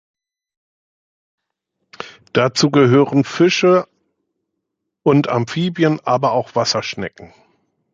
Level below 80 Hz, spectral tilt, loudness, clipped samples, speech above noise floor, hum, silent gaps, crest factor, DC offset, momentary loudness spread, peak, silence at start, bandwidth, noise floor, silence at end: -60 dBFS; -5.5 dB/octave; -16 LUFS; under 0.1%; 62 dB; none; none; 18 dB; under 0.1%; 16 LU; -2 dBFS; 2 s; 7.8 kHz; -77 dBFS; 0.65 s